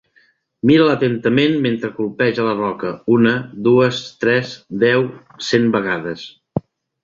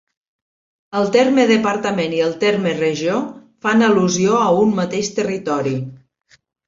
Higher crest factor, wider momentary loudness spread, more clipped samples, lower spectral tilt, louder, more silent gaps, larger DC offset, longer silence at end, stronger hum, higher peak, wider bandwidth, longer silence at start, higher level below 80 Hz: about the same, 16 dB vs 16 dB; first, 13 LU vs 9 LU; neither; first, -6.5 dB/octave vs -5 dB/octave; about the same, -17 LUFS vs -17 LUFS; neither; neither; second, 0.45 s vs 0.7 s; neither; about the same, -2 dBFS vs -2 dBFS; about the same, 7.6 kHz vs 7.8 kHz; second, 0.65 s vs 0.9 s; about the same, -56 dBFS vs -60 dBFS